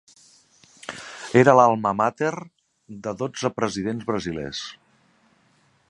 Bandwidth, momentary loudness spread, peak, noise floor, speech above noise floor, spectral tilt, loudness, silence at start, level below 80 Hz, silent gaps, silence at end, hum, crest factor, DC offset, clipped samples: 11 kHz; 22 LU; 0 dBFS; -62 dBFS; 41 dB; -5.5 dB/octave; -22 LUFS; 0.9 s; -58 dBFS; none; 1.2 s; none; 24 dB; under 0.1%; under 0.1%